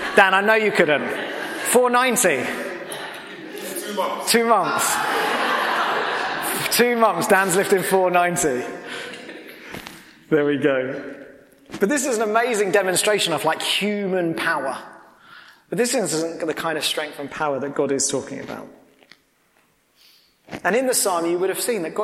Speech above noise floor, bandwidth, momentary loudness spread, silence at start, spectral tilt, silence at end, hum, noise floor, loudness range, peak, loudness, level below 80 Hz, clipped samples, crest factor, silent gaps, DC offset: 41 dB; 16.5 kHz; 16 LU; 0 s; -2.5 dB/octave; 0 s; none; -61 dBFS; 7 LU; 0 dBFS; -20 LUFS; -64 dBFS; under 0.1%; 22 dB; none; under 0.1%